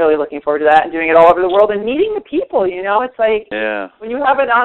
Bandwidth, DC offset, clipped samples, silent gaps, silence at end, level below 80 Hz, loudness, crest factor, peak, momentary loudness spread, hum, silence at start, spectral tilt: 4.2 kHz; under 0.1%; under 0.1%; none; 0 s; -48 dBFS; -14 LUFS; 14 dB; 0 dBFS; 10 LU; none; 0 s; -6.5 dB/octave